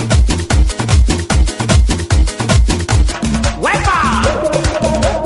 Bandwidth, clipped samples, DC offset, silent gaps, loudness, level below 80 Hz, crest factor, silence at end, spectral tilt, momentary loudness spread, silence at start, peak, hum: 11.5 kHz; under 0.1%; under 0.1%; none; -14 LUFS; -16 dBFS; 12 dB; 0 s; -5 dB/octave; 3 LU; 0 s; 0 dBFS; none